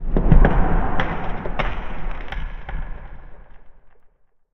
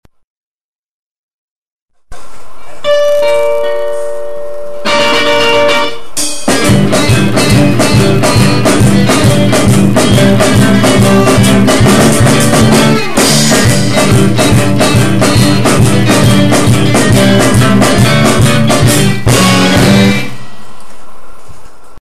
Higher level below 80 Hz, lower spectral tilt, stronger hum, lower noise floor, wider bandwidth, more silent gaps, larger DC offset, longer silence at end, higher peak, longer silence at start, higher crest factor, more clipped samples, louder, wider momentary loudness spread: first, -22 dBFS vs -28 dBFS; first, -9 dB/octave vs -5 dB/octave; neither; first, -53 dBFS vs -36 dBFS; second, 4 kHz vs 14.5 kHz; second, none vs 0.24-1.86 s; second, under 0.1% vs 20%; first, 0.65 s vs 0.1 s; about the same, 0 dBFS vs 0 dBFS; about the same, 0 s vs 0.05 s; first, 18 dB vs 10 dB; second, under 0.1% vs 0.2%; second, -24 LUFS vs -8 LUFS; first, 18 LU vs 6 LU